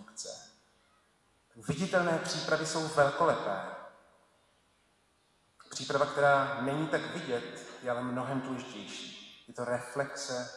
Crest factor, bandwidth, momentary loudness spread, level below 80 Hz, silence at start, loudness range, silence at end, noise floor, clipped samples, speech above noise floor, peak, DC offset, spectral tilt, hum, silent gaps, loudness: 22 dB; 12 kHz; 17 LU; -72 dBFS; 0 s; 5 LU; 0 s; -70 dBFS; under 0.1%; 39 dB; -12 dBFS; under 0.1%; -4.5 dB/octave; none; none; -32 LUFS